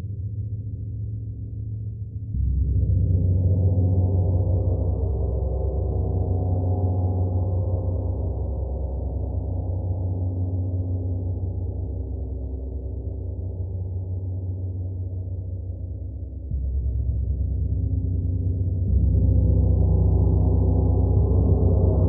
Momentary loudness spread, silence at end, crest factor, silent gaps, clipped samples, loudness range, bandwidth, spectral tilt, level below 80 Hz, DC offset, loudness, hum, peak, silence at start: 12 LU; 0 s; 14 dB; none; under 0.1%; 9 LU; 1.2 kHz; -16.5 dB/octave; -28 dBFS; under 0.1%; -25 LUFS; none; -8 dBFS; 0 s